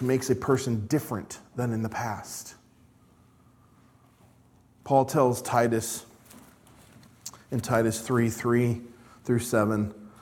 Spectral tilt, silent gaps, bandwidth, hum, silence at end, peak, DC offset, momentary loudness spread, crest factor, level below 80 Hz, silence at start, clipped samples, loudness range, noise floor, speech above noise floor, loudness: -6 dB/octave; none; 18 kHz; none; 0.15 s; -8 dBFS; under 0.1%; 15 LU; 20 dB; -62 dBFS; 0 s; under 0.1%; 9 LU; -59 dBFS; 33 dB; -27 LUFS